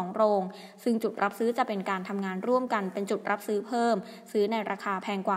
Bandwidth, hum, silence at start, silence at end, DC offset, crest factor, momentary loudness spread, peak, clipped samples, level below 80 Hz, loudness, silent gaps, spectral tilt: 16 kHz; none; 0 s; 0 s; under 0.1%; 18 dB; 5 LU; -12 dBFS; under 0.1%; -84 dBFS; -29 LUFS; none; -6 dB/octave